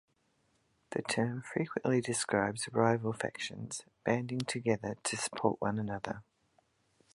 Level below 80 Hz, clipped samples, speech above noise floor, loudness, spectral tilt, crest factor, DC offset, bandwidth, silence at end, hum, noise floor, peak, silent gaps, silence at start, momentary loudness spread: -68 dBFS; under 0.1%; 41 dB; -34 LUFS; -4.5 dB/octave; 22 dB; under 0.1%; 11.5 kHz; 0.95 s; none; -75 dBFS; -14 dBFS; none; 0.9 s; 9 LU